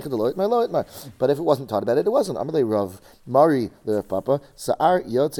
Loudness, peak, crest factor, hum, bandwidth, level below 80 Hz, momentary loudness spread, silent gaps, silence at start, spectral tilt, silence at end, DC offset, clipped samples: -22 LUFS; -4 dBFS; 18 dB; none; 19 kHz; -58 dBFS; 7 LU; none; 0 s; -6.5 dB/octave; 0 s; under 0.1%; under 0.1%